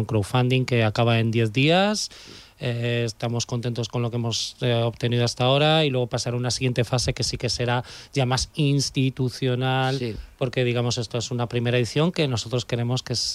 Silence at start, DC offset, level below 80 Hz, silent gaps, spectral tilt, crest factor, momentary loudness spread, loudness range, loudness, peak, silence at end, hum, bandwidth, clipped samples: 0 s; under 0.1%; -48 dBFS; none; -5 dB/octave; 14 dB; 7 LU; 2 LU; -23 LUFS; -8 dBFS; 0 s; none; 13 kHz; under 0.1%